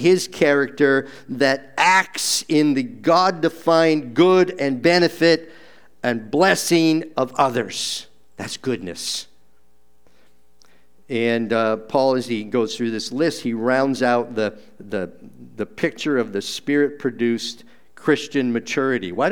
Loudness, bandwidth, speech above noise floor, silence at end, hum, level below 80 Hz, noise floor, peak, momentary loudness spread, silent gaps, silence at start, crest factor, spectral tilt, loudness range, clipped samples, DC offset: -20 LUFS; over 20 kHz; 44 dB; 0 s; none; -66 dBFS; -64 dBFS; 0 dBFS; 10 LU; none; 0 s; 20 dB; -4 dB/octave; 8 LU; under 0.1%; 0.5%